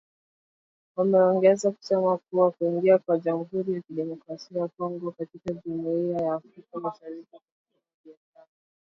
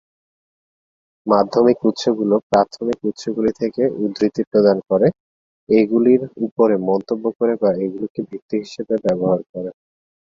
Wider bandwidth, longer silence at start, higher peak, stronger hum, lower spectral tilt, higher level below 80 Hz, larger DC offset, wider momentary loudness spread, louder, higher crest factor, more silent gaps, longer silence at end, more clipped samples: about the same, 7.8 kHz vs 7.6 kHz; second, 0.95 s vs 1.25 s; second, -8 dBFS vs -2 dBFS; neither; about the same, -7 dB/octave vs -7 dB/octave; second, -72 dBFS vs -58 dBFS; neither; first, 15 LU vs 10 LU; second, -26 LUFS vs -18 LUFS; about the same, 18 dB vs 18 dB; second, 7.52-7.65 s, 7.94-8.04 s vs 2.43-2.50 s, 4.47-4.51 s, 5.20-5.67 s, 6.52-6.56 s, 7.35-7.39 s, 8.10-8.15 s, 8.42-8.49 s, 9.49-9.54 s; about the same, 0.75 s vs 0.65 s; neither